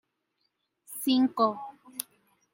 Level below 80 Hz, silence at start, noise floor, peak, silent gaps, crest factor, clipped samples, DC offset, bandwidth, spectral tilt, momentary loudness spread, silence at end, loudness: -84 dBFS; 0.9 s; -78 dBFS; -6 dBFS; none; 24 dB; under 0.1%; under 0.1%; 17 kHz; -3.5 dB/octave; 17 LU; 0.5 s; -28 LUFS